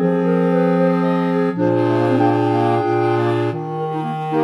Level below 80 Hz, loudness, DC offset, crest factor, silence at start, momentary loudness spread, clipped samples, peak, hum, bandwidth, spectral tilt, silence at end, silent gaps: -68 dBFS; -17 LUFS; under 0.1%; 12 dB; 0 s; 7 LU; under 0.1%; -4 dBFS; none; 9.8 kHz; -9 dB/octave; 0 s; none